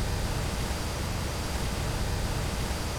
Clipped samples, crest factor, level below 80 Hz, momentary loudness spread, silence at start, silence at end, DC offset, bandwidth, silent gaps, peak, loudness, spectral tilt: under 0.1%; 12 dB; -34 dBFS; 1 LU; 0 s; 0 s; under 0.1%; 18.5 kHz; none; -18 dBFS; -31 LUFS; -4.5 dB/octave